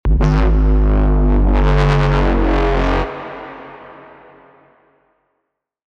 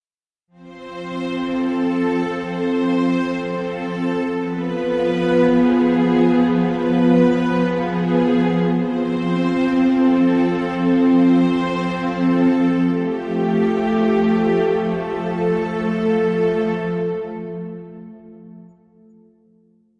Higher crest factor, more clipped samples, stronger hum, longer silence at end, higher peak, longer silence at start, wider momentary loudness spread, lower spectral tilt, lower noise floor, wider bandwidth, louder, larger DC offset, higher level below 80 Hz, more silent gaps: about the same, 16 dB vs 14 dB; neither; neither; first, 1.95 s vs 1.4 s; first, 0 dBFS vs -4 dBFS; second, 0.05 s vs 0.6 s; first, 18 LU vs 9 LU; about the same, -8 dB/octave vs -8 dB/octave; second, -74 dBFS vs -80 dBFS; second, 6.4 kHz vs 7.2 kHz; first, -15 LUFS vs -18 LUFS; neither; first, -16 dBFS vs -50 dBFS; neither